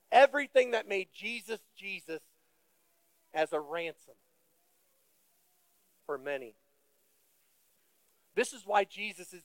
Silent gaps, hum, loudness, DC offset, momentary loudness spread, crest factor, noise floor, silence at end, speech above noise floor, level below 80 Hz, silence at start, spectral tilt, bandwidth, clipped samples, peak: none; none; -32 LUFS; under 0.1%; 16 LU; 26 dB; -74 dBFS; 0.05 s; 39 dB; under -90 dBFS; 0.1 s; -2.5 dB/octave; 17 kHz; under 0.1%; -10 dBFS